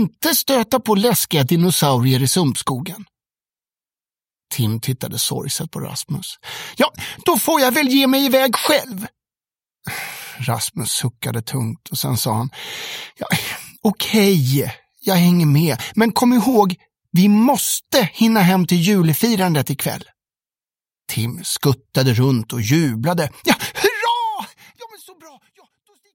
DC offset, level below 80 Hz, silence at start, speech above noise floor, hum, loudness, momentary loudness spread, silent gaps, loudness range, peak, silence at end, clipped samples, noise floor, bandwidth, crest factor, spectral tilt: under 0.1%; -56 dBFS; 0 s; over 73 dB; none; -18 LUFS; 13 LU; none; 7 LU; 0 dBFS; 0.85 s; under 0.1%; under -90 dBFS; 17 kHz; 18 dB; -4.5 dB/octave